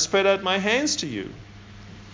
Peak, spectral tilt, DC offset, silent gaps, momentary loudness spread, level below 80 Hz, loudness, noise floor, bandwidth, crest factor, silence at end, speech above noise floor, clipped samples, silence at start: -8 dBFS; -2.5 dB/octave; under 0.1%; none; 23 LU; -54 dBFS; -22 LUFS; -43 dBFS; 7.6 kHz; 18 dB; 0 s; 20 dB; under 0.1%; 0 s